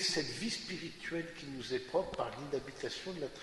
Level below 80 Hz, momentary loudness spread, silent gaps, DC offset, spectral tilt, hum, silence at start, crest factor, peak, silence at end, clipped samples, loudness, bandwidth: -62 dBFS; 7 LU; none; under 0.1%; -3.5 dB/octave; none; 0 s; 18 dB; -20 dBFS; 0 s; under 0.1%; -39 LUFS; 11.5 kHz